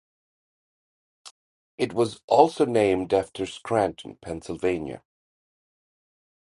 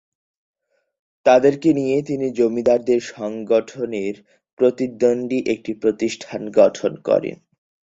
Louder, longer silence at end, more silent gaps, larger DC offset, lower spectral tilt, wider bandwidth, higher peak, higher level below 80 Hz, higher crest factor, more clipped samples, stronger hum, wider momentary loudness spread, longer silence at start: second, -24 LUFS vs -19 LUFS; first, 1.55 s vs 0.55 s; first, 1.31-1.78 s, 2.24-2.28 s vs 4.53-4.57 s; neither; about the same, -5.5 dB/octave vs -6 dB/octave; first, 11.5 kHz vs 7.8 kHz; about the same, -2 dBFS vs -2 dBFS; about the same, -56 dBFS vs -60 dBFS; first, 26 dB vs 18 dB; neither; neither; first, 17 LU vs 11 LU; about the same, 1.25 s vs 1.25 s